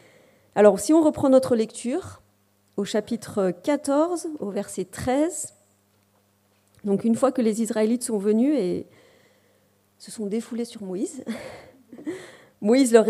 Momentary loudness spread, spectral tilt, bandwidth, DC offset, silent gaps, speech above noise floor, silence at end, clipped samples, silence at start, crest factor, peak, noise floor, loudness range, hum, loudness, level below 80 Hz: 17 LU; -5.5 dB/octave; 15.5 kHz; under 0.1%; none; 42 dB; 0 s; under 0.1%; 0.55 s; 22 dB; -2 dBFS; -64 dBFS; 10 LU; none; -23 LUFS; -62 dBFS